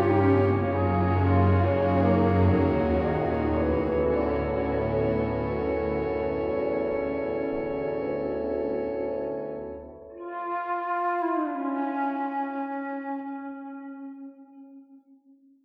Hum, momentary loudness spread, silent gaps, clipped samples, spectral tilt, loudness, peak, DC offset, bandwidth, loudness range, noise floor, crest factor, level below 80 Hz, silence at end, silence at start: none; 15 LU; none; under 0.1%; -10.5 dB/octave; -26 LUFS; -10 dBFS; under 0.1%; 5.2 kHz; 8 LU; -58 dBFS; 16 dB; -44 dBFS; 0.65 s; 0 s